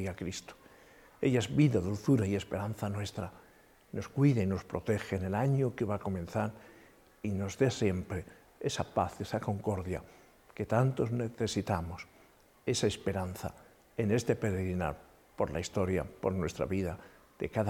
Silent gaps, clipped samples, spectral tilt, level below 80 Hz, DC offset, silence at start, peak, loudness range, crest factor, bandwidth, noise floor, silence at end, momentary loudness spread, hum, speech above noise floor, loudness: none; under 0.1%; -6.5 dB/octave; -56 dBFS; under 0.1%; 0 s; -14 dBFS; 3 LU; 20 dB; 16.5 kHz; -62 dBFS; 0 s; 13 LU; none; 30 dB; -33 LUFS